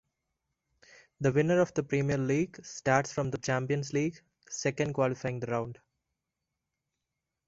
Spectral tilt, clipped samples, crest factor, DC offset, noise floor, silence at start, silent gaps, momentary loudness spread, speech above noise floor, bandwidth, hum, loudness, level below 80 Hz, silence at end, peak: -6 dB/octave; under 0.1%; 24 dB; under 0.1%; -87 dBFS; 1.2 s; none; 8 LU; 57 dB; 8 kHz; none; -30 LUFS; -64 dBFS; 1.75 s; -8 dBFS